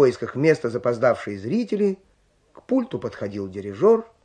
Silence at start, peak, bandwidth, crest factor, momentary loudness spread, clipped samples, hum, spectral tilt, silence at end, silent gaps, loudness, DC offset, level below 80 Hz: 0 s; -4 dBFS; 9.6 kHz; 18 dB; 11 LU; under 0.1%; none; -7.5 dB/octave; 0.2 s; none; -23 LUFS; under 0.1%; -64 dBFS